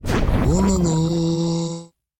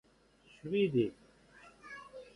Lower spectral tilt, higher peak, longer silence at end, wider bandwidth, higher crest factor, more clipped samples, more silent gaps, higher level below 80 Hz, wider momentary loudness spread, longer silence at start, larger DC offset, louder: about the same, -6.5 dB/octave vs -7.5 dB/octave; first, -6 dBFS vs -20 dBFS; first, 0.35 s vs 0.05 s; first, 16.5 kHz vs 11 kHz; second, 12 dB vs 18 dB; neither; neither; first, -28 dBFS vs -70 dBFS; second, 8 LU vs 19 LU; second, 0 s vs 0.65 s; neither; first, -20 LUFS vs -33 LUFS